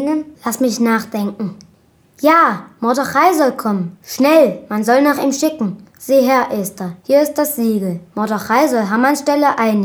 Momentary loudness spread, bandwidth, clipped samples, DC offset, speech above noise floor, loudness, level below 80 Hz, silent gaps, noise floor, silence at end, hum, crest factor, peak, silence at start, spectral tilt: 11 LU; over 20 kHz; under 0.1%; under 0.1%; 37 dB; -15 LUFS; -62 dBFS; none; -52 dBFS; 0 s; none; 14 dB; 0 dBFS; 0 s; -5 dB/octave